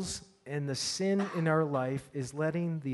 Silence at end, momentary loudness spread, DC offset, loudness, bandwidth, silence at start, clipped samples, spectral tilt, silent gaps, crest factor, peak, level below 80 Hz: 0 s; 10 LU; under 0.1%; -32 LUFS; 11.5 kHz; 0 s; under 0.1%; -5 dB/octave; none; 18 dB; -16 dBFS; -64 dBFS